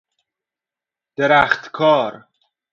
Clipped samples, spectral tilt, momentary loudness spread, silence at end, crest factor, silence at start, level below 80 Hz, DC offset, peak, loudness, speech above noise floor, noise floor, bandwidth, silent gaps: under 0.1%; -5.5 dB/octave; 12 LU; 0.55 s; 20 dB; 1.2 s; -56 dBFS; under 0.1%; 0 dBFS; -16 LUFS; 72 dB; -88 dBFS; 7.2 kHz; none